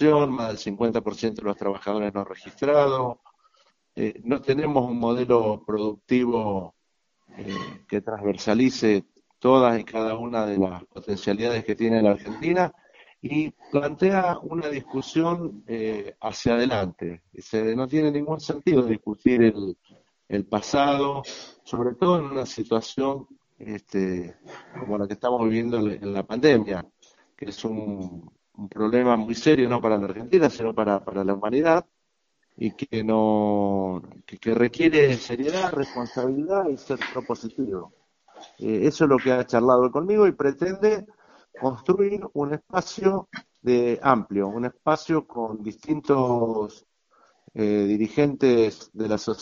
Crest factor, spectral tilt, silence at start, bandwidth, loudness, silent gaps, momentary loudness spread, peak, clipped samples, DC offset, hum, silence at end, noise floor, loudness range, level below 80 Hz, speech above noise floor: 22 dB; -5.5 dB/octave; 0 s; 7.4 kHz; -24 LUFS; none; 13 LU; -2 dBFS; under 0.1%; under 0.1%; none; 0 s; -74 dBFS; 4 LU; -58 dBFS; 51 dB